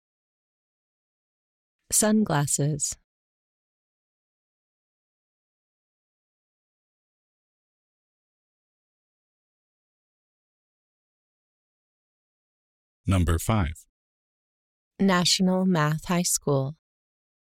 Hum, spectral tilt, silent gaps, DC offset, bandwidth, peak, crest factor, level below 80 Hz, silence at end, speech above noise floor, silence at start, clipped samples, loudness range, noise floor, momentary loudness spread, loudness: none; -4 dB/octave; 3.04-13.04 s, 13.89-14.91 s; under 0.1%; 16.5 kHz; -10 dBFS; 20 dB; -46 dBFS; 0.8 s; over 67 dB; 1.9 s; under 0.1%; 8 LU; under -90 dBFS; 9 LU; -24 LUFS